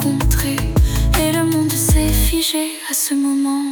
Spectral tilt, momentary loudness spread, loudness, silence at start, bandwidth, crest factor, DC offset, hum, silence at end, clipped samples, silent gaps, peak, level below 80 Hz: -4.5 dB/octave; 3 LU; -17 LUFS; 0 s; 19.5 kHz; 12 dB; under 0.1%; none; 0 s; under 0.1%; none; -4 dBFS; -20 dBFS